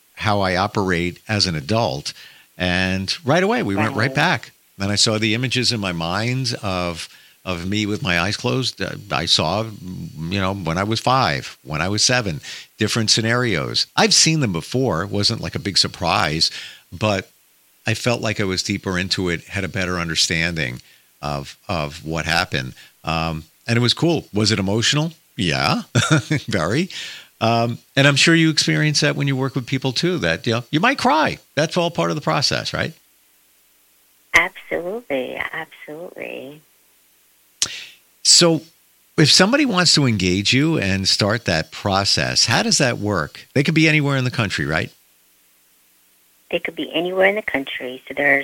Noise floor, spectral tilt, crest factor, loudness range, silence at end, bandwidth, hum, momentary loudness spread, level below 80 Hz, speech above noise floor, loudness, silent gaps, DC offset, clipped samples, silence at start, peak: -57 dBFS; -3.5 dB/octave; 20 dB; 7 LU; 0 s; 17 kHz; 60 Hz at -50 dBFS; 13 LU; -48 dBFS; 37 dB; -19 LUFS; none; under 0.1%; under 0.1%; 0.15 s; 0 dBFS